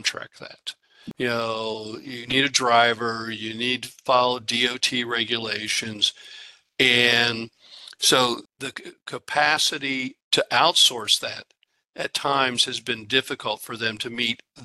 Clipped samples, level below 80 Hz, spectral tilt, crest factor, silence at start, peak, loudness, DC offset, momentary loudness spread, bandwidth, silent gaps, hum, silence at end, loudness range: under 0.1%; -68 dBFS; -2 dB/octave; 22 dB; 0 s; -4 dBFS; -22 LUFS; under 0.1%; 19 LU; 13 kHz; 10.24-10.31 s, 11.89-11.93 s; none; 0 s; 3 LU